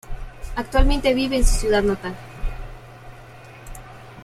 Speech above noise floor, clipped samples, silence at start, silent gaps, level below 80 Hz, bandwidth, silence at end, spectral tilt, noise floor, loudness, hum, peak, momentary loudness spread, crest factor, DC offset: 24 dB; under 0.1%; 0.1 s; none; -24 dBFS; 14 kHz; 0 s; -4.5 dB/octave; -42 dBFS; -22 LUFS; none; -2 dBFS; 23 LU; 20 dB; under 0.1%